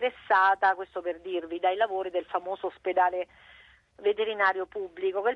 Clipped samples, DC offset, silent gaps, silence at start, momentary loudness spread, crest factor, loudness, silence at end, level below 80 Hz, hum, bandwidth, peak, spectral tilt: under 0.1%; under 0.1%; none; 0 s; 12 LU; 18 dB; -28 LUFS; 0 s; -70 dBFS; none; 6.2 kHz; -10 dBFS; -5 dB/octave